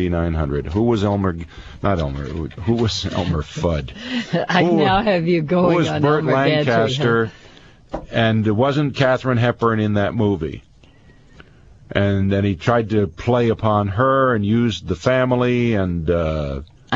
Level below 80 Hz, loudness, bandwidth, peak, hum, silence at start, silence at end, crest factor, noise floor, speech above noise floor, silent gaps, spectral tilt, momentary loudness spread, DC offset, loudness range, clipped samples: -38 dBFS; -19 LUFS; 7.8 kHz; -2 dBFS; none; 0 s; 0 s; 18 dB; -49 dBFS; 30 dB; none; -7 dB/octave; 9 LU; 0.2%; 4 LU; under 0.1%